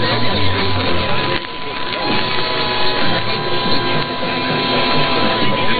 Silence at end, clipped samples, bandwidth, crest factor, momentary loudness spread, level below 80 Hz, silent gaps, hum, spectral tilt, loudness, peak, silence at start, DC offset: 0 s; under 0.1%; 13.5 kHz; 14 dB; 5 LU; -38 dBFS; none; none; -8.5 dB/octave; -17 LUFS; 0 dBFS; 0 s; under 0.1%